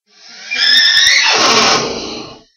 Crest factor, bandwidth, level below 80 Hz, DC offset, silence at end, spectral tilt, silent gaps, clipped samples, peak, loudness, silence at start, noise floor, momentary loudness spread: 14 dB; 17.5 kHz; -48 dBFS; under 0.1%; 0.2 s; 0 dB/octave; none; under 0.1%; 0 dBFS; -8 LUFS; 0.3 s; -36 dBFS; 16 LU